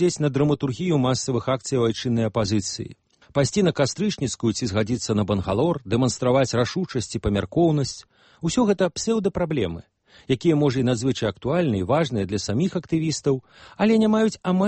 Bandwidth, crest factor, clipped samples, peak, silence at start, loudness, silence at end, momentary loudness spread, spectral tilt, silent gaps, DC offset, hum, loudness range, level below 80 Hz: 8.8 kHz; 14 dB; under 0.1%; -8 dBFS; 0 s; -23 LUFS; 0 s; 6 LU; -5.5 dB/octave; none; under 0.1%; none; 1 LU; -48 dBFS